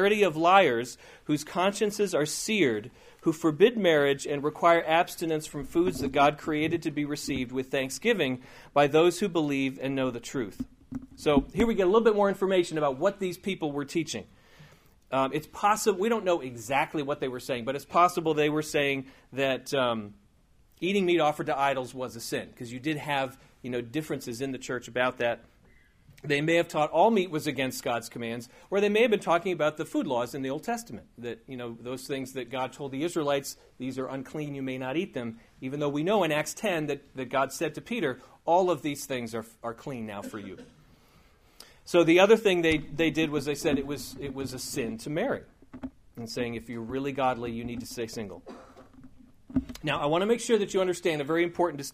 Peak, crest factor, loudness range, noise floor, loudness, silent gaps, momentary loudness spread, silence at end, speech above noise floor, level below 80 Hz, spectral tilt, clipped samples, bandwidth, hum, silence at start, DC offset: -6 dBFS; 22 dB; 8 LU; -61 dBFS; -28 LUFS; none; 14 LU; 0.05 s; 34 dB; -56 dBFS; -4.5 dB/octave; under 0.1%; 15.5 kHz; none; 0 s; under 0.1%